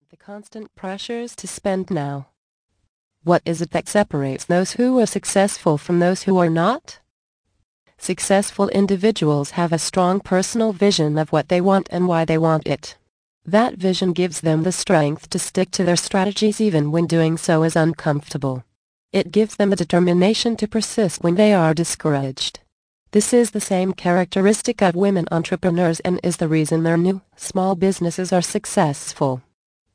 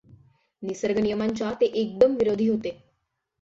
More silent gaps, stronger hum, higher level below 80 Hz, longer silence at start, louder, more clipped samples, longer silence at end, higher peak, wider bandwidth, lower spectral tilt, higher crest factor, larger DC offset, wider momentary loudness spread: first, 2.37-2.69 s, 2.89-3.11 s, 7.10-7.44 s, 7.64-7.86 s, 13.09-13.41 s, 18.76-19.09 s, 22.72-23.06 s vs none; neither; about the same, -54 dBFS vs -58 dBFS; second, 0.3 s vs 0.6 s; first, -19 LUFS vs -24 LUFS; neither; about the same, 0.55 s vs 0.65 s; first, -2 dBFS vs -6 dBFS; first, 10.5 kHz vs 7.8 kHz; about the same, -5.5 dB/octave vs -6 dB/octave; about the same, 16 dB vs 20 dB; neither; second, 9 LU vs 13 LU